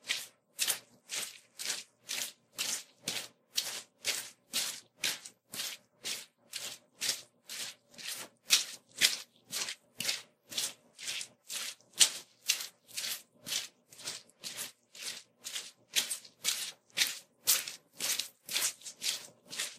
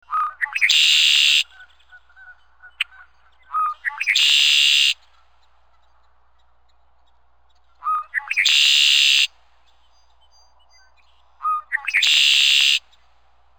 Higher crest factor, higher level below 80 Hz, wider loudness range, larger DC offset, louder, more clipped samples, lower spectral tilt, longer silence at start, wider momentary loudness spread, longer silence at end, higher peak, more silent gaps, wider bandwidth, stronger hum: first, 36 dB vs 20 dB; second, -88 dBFS vs -66 dBFS; about the same, 5 LU vs 5 LU; second, under 0.1% vs 0.2%; second, -35 LUFS vs -15 LUFS; neither; first, 2 dB/octave vs 6 dB/octave; about the same, 0.05 s vs 0.1 s; about the same, 14 LU vs 16 LU; second, 0 s vs 0.8 s; about the same, -4 dBFS vs -2 dBFS; neither; second, 15.5 kHz vs over 20 kHz; neither